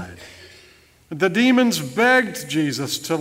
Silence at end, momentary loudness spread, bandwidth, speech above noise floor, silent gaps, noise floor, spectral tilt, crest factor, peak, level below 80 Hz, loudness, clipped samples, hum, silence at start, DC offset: 0 s; 18 LU; 16 kHz; 33 dB; none; -52 dBFS; -4 dB/octave; 16 dB; -4 dBFS; -60 dBFS; -19 LUFS; under 0.1%; none; 0 s; under 0.1%